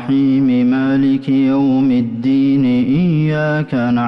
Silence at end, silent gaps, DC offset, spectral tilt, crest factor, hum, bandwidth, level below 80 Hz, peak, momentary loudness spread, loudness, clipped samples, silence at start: 0 s; none; under 0.1%; -9.5 dB/octave; 6 dB; none; 5.8 kHz; -48 dBFS; -8 dBFS; 3 LU; -14 LUFS; under 0.1%; 0 s